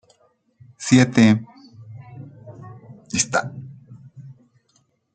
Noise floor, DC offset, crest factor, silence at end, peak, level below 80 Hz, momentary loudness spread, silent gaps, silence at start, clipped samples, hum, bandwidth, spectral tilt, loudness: -64 dBFS; under 0.1%; 22 dB; 0.85 s; 0 dBFS; -60 dBFS; 26 LU; none; 0.8 s; under 0.1%; none; 9.6 kHz; -5 dB/octave; -18 LUFS